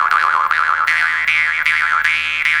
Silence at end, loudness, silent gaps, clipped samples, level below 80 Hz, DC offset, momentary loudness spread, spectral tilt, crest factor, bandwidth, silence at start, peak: 0 s; -14 LUFS; none; under 0.1%; -52 dBFS; under 0.1%; 1 LU; 0.5 dB/octave; 16 dB; 18 kHz; 0 s; 0 dBFS